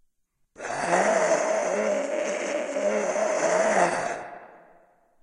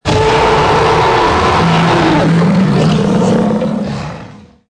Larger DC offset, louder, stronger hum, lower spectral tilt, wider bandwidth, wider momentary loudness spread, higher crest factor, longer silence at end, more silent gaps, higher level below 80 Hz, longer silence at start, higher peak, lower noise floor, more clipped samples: neither; second, -25 LUFS vs -11 LUFS; neither; second, -3 dB/octave vs -6 dB/octave; about the same, 11 kHz vs 10.5 kHz; first, 12 LU vs 8 LU; first, 18 dB vs 10 dB; first, 0.65 s vs 0.4 s; neither; second, -72 dBFS vs -30 dBFS; first, 0.6 s vs 0.05 s; second, -8 dBFS vs 0 dBFS; first, -71 dBFS vs -33 dBFS; neither